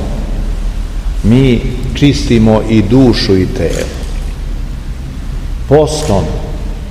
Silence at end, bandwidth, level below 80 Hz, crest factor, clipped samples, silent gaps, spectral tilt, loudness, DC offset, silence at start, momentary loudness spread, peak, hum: 0 s; 13 kHz; -18 dBFS; 12 dB; 1%; none; -6.5 dB/octave; -12 LUFS; 0.5%; 0 s; 15 LU; 0 dBFS; none